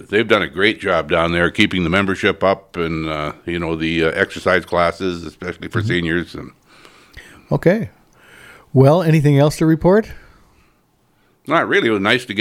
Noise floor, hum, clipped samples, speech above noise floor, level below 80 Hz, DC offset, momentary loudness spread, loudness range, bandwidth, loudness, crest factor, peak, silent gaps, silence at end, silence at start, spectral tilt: -59 dBFS; none; under 0.1%; 42 dB; -44 dBFS; under 0.1%; 11 LU; 6 LU; 15.5 kHz; -17 LUFS; 18 dB; 0 dBFS; none; 0 s; 0 s; -6.5 dB/octave